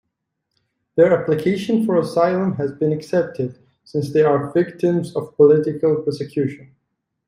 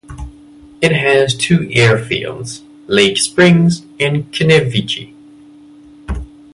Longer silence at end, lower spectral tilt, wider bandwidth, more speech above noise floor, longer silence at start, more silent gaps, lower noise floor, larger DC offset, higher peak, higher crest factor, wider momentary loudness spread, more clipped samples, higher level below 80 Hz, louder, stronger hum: first, 0.6 s vs 0.3 s; first, -8 dB/octave vs -5 dB/octave; about the same, 12 kHz vs 11.5 kHz; first, 59 dB vs 28 dB; first, 0.95 s vs 0.1 s; neither; first, -77 dBFS vs -40 dBFS; neither; about the same, -2 dBFS vs 0 dBFS; about the same, 16 dB vs 14 dB; second, 11 LU vs 17 LU; neither; second, -62 dBFS vs -36 dBFS; second, -19 LUFS vs -13 LUFS; neither